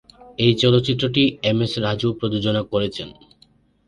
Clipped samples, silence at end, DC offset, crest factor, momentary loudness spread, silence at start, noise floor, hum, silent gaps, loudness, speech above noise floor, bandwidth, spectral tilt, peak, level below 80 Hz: under 0.1%; 0.75 s; under 0.1%; 18 dB; 10 LU; 0.2 s; -57 dBFS; none; none; -20 LUFS; 37 dB; 11 kHz; -6.5 dB/octave; -2 dBFS; -50 dBFS